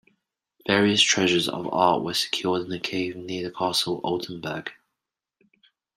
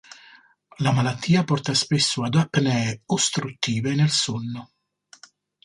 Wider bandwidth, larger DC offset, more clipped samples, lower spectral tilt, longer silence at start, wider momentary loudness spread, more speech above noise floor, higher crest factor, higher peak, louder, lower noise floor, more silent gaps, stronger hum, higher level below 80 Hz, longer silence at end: first, 15.5 kHz vs 11.5 kHz; neither; neither; second, -3 dB/octave vs -4.5 dB/octave; second, 0.65 s vs 0.8 s; first, 14 LU vs 6 LU; first, 61 dB vs 31 dB; about the same, 22 dB vs 18 dB; about the same, -4 dBFS vs -6 dBFS; about the same, -24 LUFS vs -22 LUFS; first, -85 dBFS vs -53 dBFS; neither; second, none vs 50 Hz at -45 dBFS; second, -66 dBFS vs -60 dBFS; first, 1.25 s vs 1 s